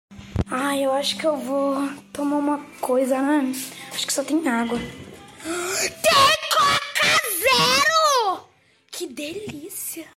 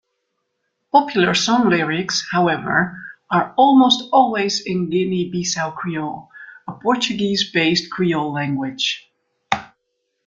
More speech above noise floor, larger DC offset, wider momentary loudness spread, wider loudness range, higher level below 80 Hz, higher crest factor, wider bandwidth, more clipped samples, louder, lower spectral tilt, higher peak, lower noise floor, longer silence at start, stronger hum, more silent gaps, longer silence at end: second, 33 dB vs 55 dB; neither; first, 16 LU vs 11 LU; about the same, 6 LU vs 4 LU; first, -48 dBFS vs -58 dBFS; about the same, 16 dB vs 20 dB; first, 16.5 kHz vs 9 kHz; neither; second, -21 LUFS vs -18 LUFS; second, -2.5 dB/octave vs -4 dB/octave; second, -6 dBFS vs 0 dBFS; second, -56 dBFS vs -73 dBFS; second, 0.1 s vs 0.95 s; neither; neither; second, 0.15 s vs 0.6 s